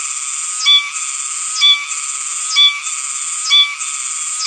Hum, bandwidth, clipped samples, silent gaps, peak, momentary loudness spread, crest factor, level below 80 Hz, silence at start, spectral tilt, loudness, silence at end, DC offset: none; 11 kHz; under 0.1%; none; 0 dBFS; 9 LU; 16 dB; under -90 dBFS; 0 s; 7.5 dB/octave; -13 LUFS; 0 s; under 0.1%